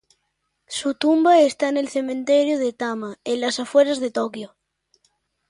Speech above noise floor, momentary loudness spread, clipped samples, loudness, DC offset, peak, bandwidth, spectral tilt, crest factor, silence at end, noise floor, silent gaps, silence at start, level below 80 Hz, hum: 54 dB; 14 LU; under 0.1%; -20 LUFS; under 0.1%; -4 dBFS; 11.5 kHz; -3.5 dB/octave; 18 dB; 1.05 s; -74 dBFS; none; 0.7 s; -70 dBFS; none